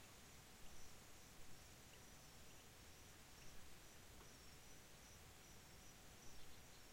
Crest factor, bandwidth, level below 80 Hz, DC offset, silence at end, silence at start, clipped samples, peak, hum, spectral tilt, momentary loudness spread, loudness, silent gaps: 14 dB; 16.5 kHz; -70 dBFS; under 0.1%; 0 s; 0 s; under 0.1%; -46 dBFS; none; -2.5 dB/octave; 1 LU; -63 LUFS; none